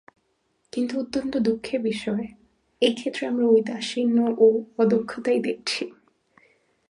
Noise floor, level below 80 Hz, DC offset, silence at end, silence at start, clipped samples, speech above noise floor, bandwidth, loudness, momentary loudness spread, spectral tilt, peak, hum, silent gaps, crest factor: -70 dBFS; -64 dBFS; under 0.1%; 0.95 s; 0.75 s; under 0.1%; 47 dB; 11 kHz; -24 LUFS; 10 LU; -5 dB/octave; -6 dBFS; none; none; 18 dB